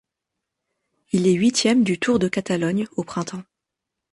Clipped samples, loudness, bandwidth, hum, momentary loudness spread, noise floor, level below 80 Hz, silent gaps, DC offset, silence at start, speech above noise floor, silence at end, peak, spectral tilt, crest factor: under 0.1%; -21 LUFS; 11.5 kHz; none; 11 LU; -83 dBFS; -58 dBFS; none; under 0.1%; 1.15 s; 63 dB; 0.7 s; -6 dBFS; -5 dB/octave; 16 dB